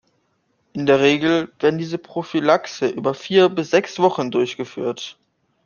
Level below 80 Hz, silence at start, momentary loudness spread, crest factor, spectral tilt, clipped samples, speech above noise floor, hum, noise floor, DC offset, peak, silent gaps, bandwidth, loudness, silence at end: -64 dBFS; 0.75 s; 11 LU; 18 dB; -5.5 dB/octave; under 0.1%; 48 dB; none; -67 dBFS; under 0.1%; -2 dBFS; none; 7.2 kHz; -19 LUFS; 0.55 s